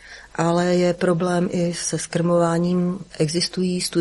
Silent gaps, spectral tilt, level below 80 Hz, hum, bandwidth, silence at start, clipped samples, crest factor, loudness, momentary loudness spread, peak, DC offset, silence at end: none; -5.5 dB/octave; -54 dBFS; none; 11.5 kHz; 0.05 s; under 0.1%; 14 dB; -21 LUFS; 6 LU; -6 dBFS; under 0.1%; 0 s